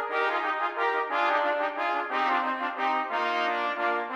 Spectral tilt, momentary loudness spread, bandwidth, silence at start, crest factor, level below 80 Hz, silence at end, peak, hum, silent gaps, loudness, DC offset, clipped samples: -2 dB/octave; 3 LU; 14 kHz; 0 s; 14 dB; -82 dBFS; 0 s; -14 dBFS; none; none; -27 LUFS; under 0.1%; under 0.1%